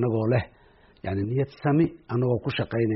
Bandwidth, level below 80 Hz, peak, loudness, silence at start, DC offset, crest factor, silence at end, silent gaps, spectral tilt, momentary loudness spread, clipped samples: 5.8 kHz; -54 dBFS; -12 dBFS; -26 LUFS; 0 s; under 0.1%; 14 dB; 0 s; none; -7 dB/octave; 8 LU; under 0.1%